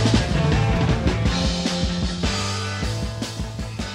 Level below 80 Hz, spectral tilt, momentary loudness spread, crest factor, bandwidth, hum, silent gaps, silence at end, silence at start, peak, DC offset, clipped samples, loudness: -28 dBFS; -5 dB/octave; 9 LU; 16 dB; 12.5 kHz; none; none; 0 s; 0 s; -6 dBFS; under 0.1%; under 0.1%; -23 LUFS